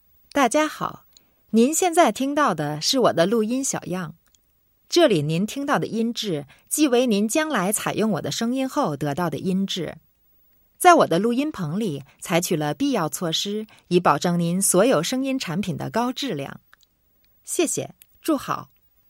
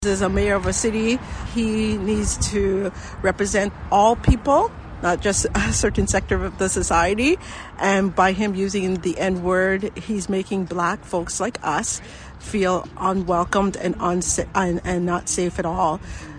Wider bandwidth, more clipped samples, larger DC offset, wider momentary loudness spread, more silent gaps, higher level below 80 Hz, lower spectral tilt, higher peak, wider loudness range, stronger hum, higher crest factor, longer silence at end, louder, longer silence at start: first, 16.5 kHz vs 10 kHz; neither; neither; first, 11 LU vs 7 LU; neither; second, -64 dBFS vs -34 dBFS; about the same, -4 dB/octave vs -4.5 dB/octave; first, 0 dBFS vs -4 dBFS; about the same, 4 LU vs 3 LU; neither; about the same, 22 dB vs 18 dB; first, 0.45 s vs 0 s; about the same, -22 LUFS vs -21 LUFS; first, 0.35 s vs 0 s